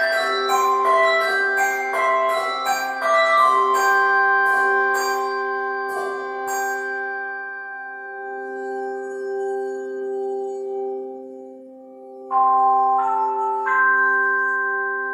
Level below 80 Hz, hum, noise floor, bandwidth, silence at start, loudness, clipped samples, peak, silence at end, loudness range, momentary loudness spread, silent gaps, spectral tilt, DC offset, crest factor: -82 dBFS; none; -41 dBFS; 16 kHz; 0 s; -20 LUFS; under 0.1%; -6 dBFS; 0 s; 10 LU; 14 LU; none; -0.5 dB/octave; under 0.1%; 16 dB